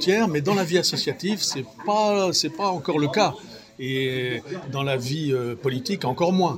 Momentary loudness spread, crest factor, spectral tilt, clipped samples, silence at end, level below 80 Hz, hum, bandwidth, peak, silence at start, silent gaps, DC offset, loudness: 8 LU; 16 dB; -4.5 dB/octave; under 0.1%; 0 s; -64 dBFS; none; 16.5 kHz; -6 dBFS; 0 s; none; under 0.1%; -24 LUFS